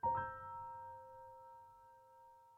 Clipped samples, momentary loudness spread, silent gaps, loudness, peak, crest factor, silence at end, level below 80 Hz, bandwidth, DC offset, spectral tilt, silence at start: under 0.1%; 21 LU; none; -48 LUFS; -28 dBFS; 18 dB; 0 s; -72 dBFS; 4.1 kHz; under 0.1%; -7.5 dB/octave; 0.05 s